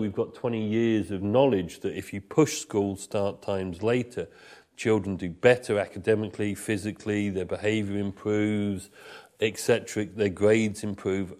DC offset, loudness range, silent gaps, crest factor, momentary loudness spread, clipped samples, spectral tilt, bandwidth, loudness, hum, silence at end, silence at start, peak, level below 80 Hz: under 0.1%; 2 LU; none; 20 dB; 10 LU; under 0.1%; -5.5 dB/octave; 15.5 kHz; -27 LUFS; none; 0.05 s; 0 s; -6 dBFS; -62 dBFS